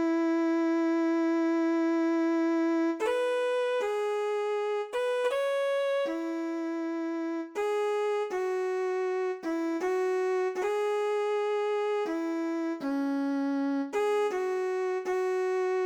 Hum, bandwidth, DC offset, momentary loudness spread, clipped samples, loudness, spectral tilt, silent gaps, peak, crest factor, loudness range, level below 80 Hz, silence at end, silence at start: none; 11 kHz; under 0.1%; 5 LU; under 0.1%; -29 LUFS; -3.5 dB/octave; none; -18 dBFS; 10 dB; 3 LU; -78 dBFS; 0 s; 0 s